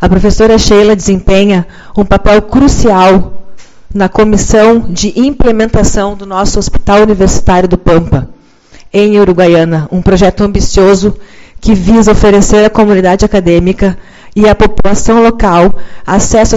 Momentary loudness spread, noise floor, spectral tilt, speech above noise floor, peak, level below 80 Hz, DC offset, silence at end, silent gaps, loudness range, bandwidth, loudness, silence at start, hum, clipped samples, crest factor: 8 LU; -36 dBFS; -5.5 dB/octave; 30 dB; 0 dBFS; -18 dBFS; under 0.1%; 0 s; none; 2 LU; 8 kHz; -7 LUFS; 0 s; none; 3%; 6 dB